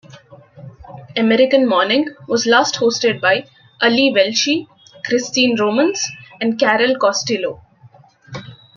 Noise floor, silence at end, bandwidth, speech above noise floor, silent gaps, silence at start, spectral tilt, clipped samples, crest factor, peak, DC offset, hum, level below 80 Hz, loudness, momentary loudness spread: -47 dBFS; 0.2 s; 7.4 kHz; 32 dB; none; 0.15 s; -3 dB/octave; under 0.1%; 16 dB; -2 dBFS; under 0.1%; none; -60 dBFS; -16 LUFS; 13 LU